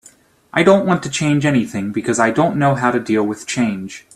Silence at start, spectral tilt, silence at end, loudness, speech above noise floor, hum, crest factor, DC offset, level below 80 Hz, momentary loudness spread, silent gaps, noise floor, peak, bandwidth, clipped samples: 0.55 s; -5.5 dB/octave; 0.15 s; -17 LUFS; 33 dB; none; 16 dB; under 0.1%; -54 dBFS; 8 LU; none; -49 dBFS; 0 dBFS; 13.5 kHz; under 0.1%